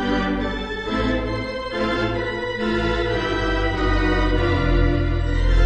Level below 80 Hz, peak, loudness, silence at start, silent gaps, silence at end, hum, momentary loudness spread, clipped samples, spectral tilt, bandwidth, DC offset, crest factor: -24 dBFS; -6 dBFS; -22 LUFS; 0 s; none; 0 s; none; 5 LU; under 0.1%; -7 dB/octave; 8.4 kHz; under 0.1%; 14 dB